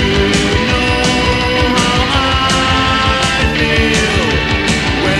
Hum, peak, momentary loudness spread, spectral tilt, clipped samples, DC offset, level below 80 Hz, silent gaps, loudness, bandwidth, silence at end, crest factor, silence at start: none; 0 dBFS; 2 LU; -4 dB/octave; under 0.1%; under 0.1%; -22 dBFS; none; -12 LUFS; 15 kHz; 0 s; 12 dB; 0 s